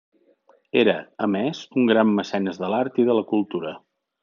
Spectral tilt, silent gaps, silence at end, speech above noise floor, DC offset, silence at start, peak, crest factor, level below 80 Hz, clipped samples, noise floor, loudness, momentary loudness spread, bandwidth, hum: -4.5 dB/octave; none; 0.45 s; 38 dB; under 0.1%; 0.75 s; -4 dBFS; 18 dB; -76 dBFS; under 0.1%; -59 dBFS; -22 LUFS; 9 LU; 7.2 kHz; none